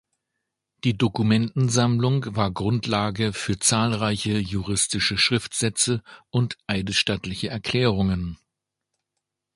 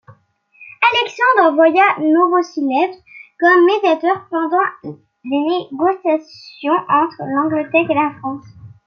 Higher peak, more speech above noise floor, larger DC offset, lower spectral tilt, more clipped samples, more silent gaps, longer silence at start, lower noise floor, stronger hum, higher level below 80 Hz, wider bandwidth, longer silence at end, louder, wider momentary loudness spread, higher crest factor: second, -6 dBFS vs 0 dBFS; first, 60 dB vs 37 dB; neither; second, -4 dB/octave vs -5.5 dB/octave; neither; neither; first, 0.85 s vs 0.1 s; first, -83 dBFS vs -52 dBFS; neither; first, -46 dBFS vs -68 dBFS; first, 11.5 kHz vs 6.8 kHz; first, 1.2 s vs 0.2 s; second, -23 LUFS vs -15 LUFS; second, 7 LU vs 10 LU; about the same, 20 dB vs 16 dB